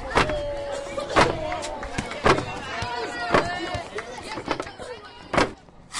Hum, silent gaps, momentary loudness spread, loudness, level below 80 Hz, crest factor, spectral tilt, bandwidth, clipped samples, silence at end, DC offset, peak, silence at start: none; none; 13 LU; -26 LUFS; -42 dBFS; 20 dB; -4.5 dB/octave; 11.5 kHz; under 0.1%; 0 s; under 0.1%; -6 dBFS; 0 s